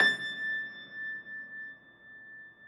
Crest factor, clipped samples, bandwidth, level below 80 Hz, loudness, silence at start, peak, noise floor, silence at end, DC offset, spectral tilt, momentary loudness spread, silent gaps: 26 dB; under 0.1%; 13.5 kHz; -82 dBFS; -35 LUFS; 0 s; -10 dBFS; -53 dBFS; 0 s; under 0.1%; -2 dB/octave; 17 LU; none